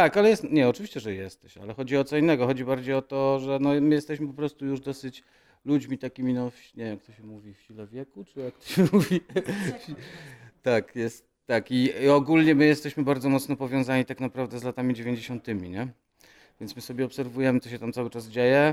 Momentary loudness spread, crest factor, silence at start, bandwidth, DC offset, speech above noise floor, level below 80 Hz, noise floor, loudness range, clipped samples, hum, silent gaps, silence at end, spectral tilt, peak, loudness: 20 LU; 18 dB; 0 s; 15.5 kHz; under 0.1%; 32 dB; -64 dBFS; -58 dBFS; 9 LU; under 0.1%; none; none; 0 s; -6.5 dB/octave; -6 dBFS; -26 LUFS